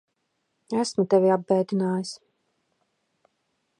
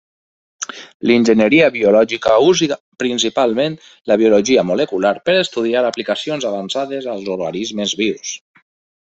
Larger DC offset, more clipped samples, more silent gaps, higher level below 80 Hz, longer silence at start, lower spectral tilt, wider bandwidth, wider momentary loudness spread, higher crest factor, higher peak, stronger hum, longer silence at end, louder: neither; neither; second, none vs 0.94-1.00 s, 2.80-2.92 s; second, -78 dBFS vs -56 dBFS; about the same, 0.7 s vs 0.6 s; first, -6 dB/octave vs -4 dB/octave; first, 11 kHz vs 8.2 kHz; about the same, 12 LU vs 12 LU; first, 20 dB vs 14 dB; second, -8 dBFS vs -2 dBFS; neither; first, 1.65 s vs 0.65 s; second, -24 LUFS vs -16 LUFS